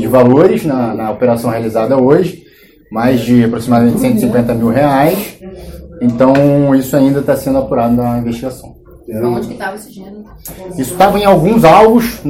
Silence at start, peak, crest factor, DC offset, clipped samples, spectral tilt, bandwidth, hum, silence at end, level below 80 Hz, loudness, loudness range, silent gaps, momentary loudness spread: 0 s; 0 dBFS; 12 dB; under 0.1%; 1%; -7 dB/octave; 16.5 kHz; none; 0 s; -38 dBFS; -11 LUFS; 5 LU; none; 18 LU